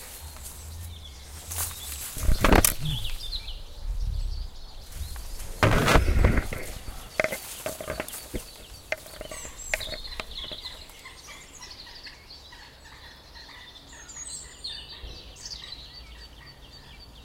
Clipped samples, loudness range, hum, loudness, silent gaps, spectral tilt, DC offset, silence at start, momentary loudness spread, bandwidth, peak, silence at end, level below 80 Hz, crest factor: under 0.1%; 14 LU; none; -29 LUFS; none; -4 dB/octave; under 0.1%; 0 s; 22 LU; 16.5 kHz; -2 dBFS; 0 s; -34 dBFS; 28 dB